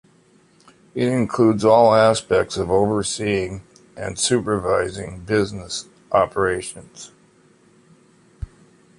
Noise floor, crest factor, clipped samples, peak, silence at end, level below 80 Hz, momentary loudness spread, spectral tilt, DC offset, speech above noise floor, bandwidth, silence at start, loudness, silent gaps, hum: -55 dBFS; 18 dB; under 0.1%; -2 dBFS; 0.55 s; -46 dBFS; 24 LU; -5 dB/octave; under 0.1%; 36 dB; 11.5 kHz; 0.95 s; -19 LUFS; none; none